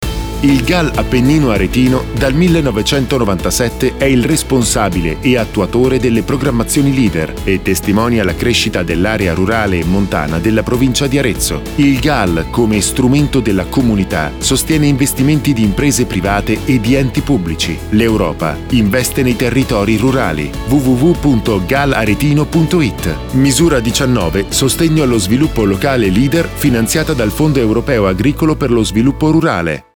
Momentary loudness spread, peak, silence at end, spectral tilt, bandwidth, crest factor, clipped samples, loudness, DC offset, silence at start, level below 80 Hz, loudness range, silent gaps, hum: 4 LU; -2 dBFS; 0.15 s; -5 dB/octave; over 20 kHz; 10 dB; under 0.1%; -13 LUFS; 0.1%; 0 s; -26 dBFS; 1 LU; none; none